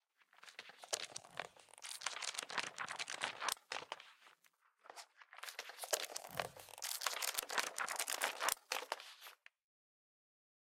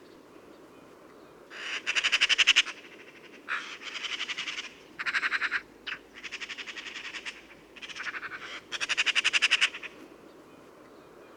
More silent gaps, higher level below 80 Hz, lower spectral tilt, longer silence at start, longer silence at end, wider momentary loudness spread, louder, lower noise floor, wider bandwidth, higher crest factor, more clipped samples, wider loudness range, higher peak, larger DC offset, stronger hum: neither; second, -86 dBFS vs -72 dBFS; about the same, 1 dB/octave vs 1.5 dB/octave; first, 0.35 s vs 0 s; first, 1.3 s vs 0 s; second, 18 LU vs 21 LU; second, -42 LUFS vs -28 LUFS; first, -75 dBFS vs -52 dBFS; second, 16.5 kHz vs 19.5 kHz; first, 36 dB vs 26 dB; neither; about the same, 6 LU vs 8 LU; about the same, -10 dBFS vs -8 dBFS; neither; neither